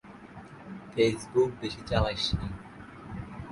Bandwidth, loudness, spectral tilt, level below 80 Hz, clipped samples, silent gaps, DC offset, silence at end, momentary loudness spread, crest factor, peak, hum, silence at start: 11.5 kHz; -29 LUFS; -5.5 dB/octave; -44 dBFS; under 0.1%; none; under 0.1%; 0 s; 20 LU; 22 dB; -10 dBFS; none; 0.05 s